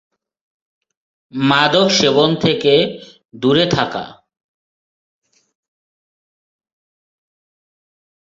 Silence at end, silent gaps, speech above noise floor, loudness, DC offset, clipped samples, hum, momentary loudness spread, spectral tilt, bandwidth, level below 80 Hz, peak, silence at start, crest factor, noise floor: 4.25 s; 3.25-3.29 s; over 75 dB; -14 LUFS; under 0.1%; under 0.1%; none; 16 LU; -4.5 dB/octave; 7.8 kHz; -56 dBFS; 0 dBFS; 1.35 s; 18 dB; under -90 dBFS